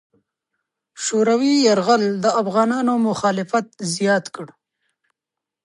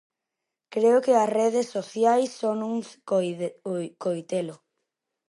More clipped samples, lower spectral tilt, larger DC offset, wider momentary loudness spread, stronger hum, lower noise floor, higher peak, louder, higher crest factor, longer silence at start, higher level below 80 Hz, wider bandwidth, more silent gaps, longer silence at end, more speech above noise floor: neither; about the same, -4.5 dB/octave vs -5.5 dB/octave; neither; about the same, 11 LU vs 11 LU; neither; about the same, -86 dBFS vs -85 dBFS; first, -4 dBFS vs -8 dBFS; first, -19 LUFS vs -25 LUFS; about the same, 16 dB vs 18 dB; first, 0.95 s vs 0.7 s; first, -68 dBFS vs -82 dBFS; about the same, 11.5 kHz vs 11.5 kHz; neither; first, 1.15 s vs 0.75 s; first, 67 dB vs 61 dB